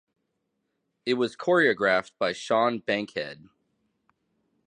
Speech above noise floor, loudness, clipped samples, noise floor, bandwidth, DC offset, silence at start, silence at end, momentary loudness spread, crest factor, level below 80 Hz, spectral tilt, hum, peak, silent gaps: 53 dB; -25 LUFS; under 0.1%; -78 dBFS; 10 kHz; under 0.1%; 1.05 s; 1.3 s; 12 LU; 20 dB; -72 dBFS; -4.5 dB/octave; none; -8 dBFS; none